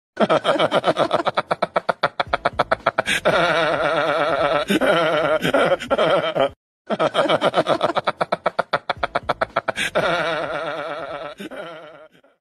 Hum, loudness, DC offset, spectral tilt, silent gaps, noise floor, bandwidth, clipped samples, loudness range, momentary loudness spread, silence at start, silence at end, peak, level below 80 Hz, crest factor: none; -20 LUFS; under 0.1%; -4.5 dB/octave; 6.56-6.85 s; -47 dBFS; 13 kHz; under 0.1%; 5 LU; 10 LU; 0.15 s; 0.35 s; 0 dBFS; -52 dBFS; 20 dB